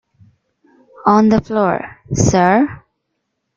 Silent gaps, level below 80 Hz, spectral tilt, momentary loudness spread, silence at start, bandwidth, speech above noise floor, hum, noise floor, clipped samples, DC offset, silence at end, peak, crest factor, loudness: none; -42 dBFS; -6 dB/octave; 9 LU; 1.05 s; 7.6 kHz; 59 dB; none; -72 dBFS; under 0.1%; under 0.1%; 0.8 s; -2 dBFS; 16 dB; -15 LUFS